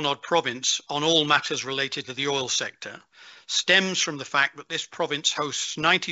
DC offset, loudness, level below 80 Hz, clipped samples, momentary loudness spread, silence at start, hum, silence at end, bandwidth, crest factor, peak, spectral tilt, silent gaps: under 0.1%; -24 LUFS; -70 dBFS; under 0.1%; 9 LU; 0 s; none; 0 s; 8.2 kHz; 20 dB; -4 dBFS; -1.5 dB/octave; none